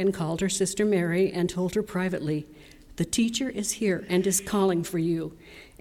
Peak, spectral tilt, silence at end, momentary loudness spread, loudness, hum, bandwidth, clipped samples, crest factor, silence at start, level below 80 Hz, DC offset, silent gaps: -12 dBFS; -4.5 dB/octave; 0.15 s; 8 LU; -26 LUFS; none; 18 kHz; under 0.1%; 14 dB; 0 s; -54 dBFS; under 0.1%; none